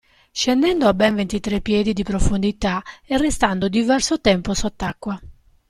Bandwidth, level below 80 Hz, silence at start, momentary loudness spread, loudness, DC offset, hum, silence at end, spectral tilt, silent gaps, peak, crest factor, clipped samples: 14 kHz; -32 dBFS; 0.35 s; 10 LU; -20 LUFS; under 0.1%; none; 0.35 s; -4.5 dB/octave; none; -4 dBFS; 16 dB; under 0.1%